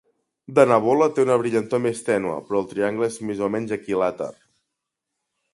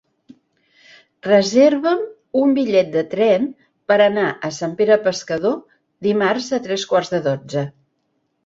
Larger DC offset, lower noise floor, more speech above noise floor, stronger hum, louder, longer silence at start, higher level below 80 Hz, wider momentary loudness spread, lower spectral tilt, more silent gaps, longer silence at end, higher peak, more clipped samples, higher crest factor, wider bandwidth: neither; first, -82 dBFS vs -69 dBFS; first, 61 dB vs 52 dB; neither; second, -22 LUFS vs -18 LUFS; second, 0.5 s vs 1.25 s; about the same, -64 dBFS vs -64 dBFS; about the same, 9 LU vs 11 LU; about the same, -6 dB/octave vs -5 dB/octave; neither; first, 1.2 s vs 0.75 s; about the same, -2 dBFS vs -2 dBFS; neither; about the same, 20 dB vs 18 dB; first, 11.5 kHz vs 7.8 kHz